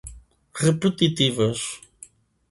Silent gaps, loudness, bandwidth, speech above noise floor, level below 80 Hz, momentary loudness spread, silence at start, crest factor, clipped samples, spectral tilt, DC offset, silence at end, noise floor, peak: none; -22 LUFS; 11.5 kHz; 28 dB; -52 dBFS; 19 LU; 0.05 s; 20 dB; under 0.1%; -5 dB/octave; under 0.1%; 0.75 s; -50 dBFS; -4 dBFS